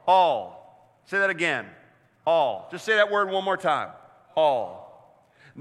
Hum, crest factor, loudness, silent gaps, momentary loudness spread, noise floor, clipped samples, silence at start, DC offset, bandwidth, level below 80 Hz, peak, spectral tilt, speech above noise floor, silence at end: none; 18 dB; -24 LUFS; none; 16 LU; -56 dBFS; under 0.1%; 0.05 s; under 0.1%; 12 kHz; -78 dBFS; -6 dBFS; -4 dB/octave; 32 dB; 0 s